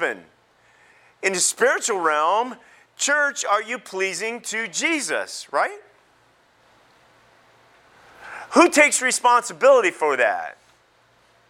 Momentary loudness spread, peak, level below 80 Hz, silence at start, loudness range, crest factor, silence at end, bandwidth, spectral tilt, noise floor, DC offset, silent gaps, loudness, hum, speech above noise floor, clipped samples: 11 LU; -2 dBFS; -76 dBFS; 0 s; 9 LU; 22 dB; 1 s; 16.5 kHz; -1 dB/octave; -59 dBFS; under 0.1%; none; -20 LUFS; none; 39 dB; under 0.1%